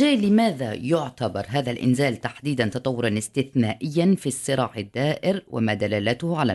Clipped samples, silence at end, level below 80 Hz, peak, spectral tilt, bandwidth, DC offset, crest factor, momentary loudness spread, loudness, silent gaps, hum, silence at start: under 0.1%; 0 s; -60 dBFS; -8 dBFS; -6 dB/octave; 12 kHz; under 0.1%; 16 dB; 6 LU; -24 LUFS; none; none; 0 s